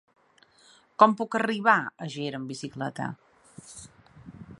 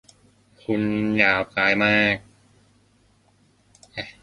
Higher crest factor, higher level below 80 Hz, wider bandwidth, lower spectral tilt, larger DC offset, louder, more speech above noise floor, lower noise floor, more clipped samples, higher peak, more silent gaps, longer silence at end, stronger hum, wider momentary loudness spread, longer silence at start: about the same, 26 dB vs 24 dB; second, -68 dBFS vs -56 dBFS; about the same, 11.5 kHz vs 11 kHz; about the same, -5 dB/octave vs -6 dB/octave; neither; second, -26 LUFS vs -20 LUFS; second, 35 dB vs 39 dB; about the same, -61 dBFS vs -60 dBFS; neither; about the same, -2 dBFS vs -2 dBFS; neither; about the same, 0.05 s vs 0.1 s; neither; first, 24 LU vs 17 LU; first, 1 s vs 0.7 s